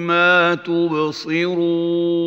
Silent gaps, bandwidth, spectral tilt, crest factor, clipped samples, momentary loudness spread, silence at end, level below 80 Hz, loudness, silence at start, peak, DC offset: none; 7.2 kHz; -6 dB/octave; 16 dB; under 0.1%; 7 LU; 0 s; -72 dBFS; -17 LUFS; 0 s; -2 dBFS; under 0.1%